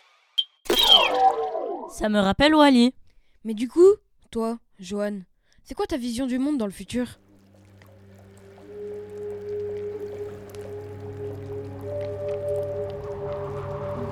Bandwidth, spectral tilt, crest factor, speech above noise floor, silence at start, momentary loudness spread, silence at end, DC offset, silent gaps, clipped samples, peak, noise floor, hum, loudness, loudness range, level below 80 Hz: over 20 kHz; -4.5 dB/octave; 22 dB; 32 dB; 0.35 s; 20 LU; 0 s; under 0.1%; none; under 0.1%; -2 dBFS; -53 dBFS; none; -23 LUFS; 16 LU; -50 dBFS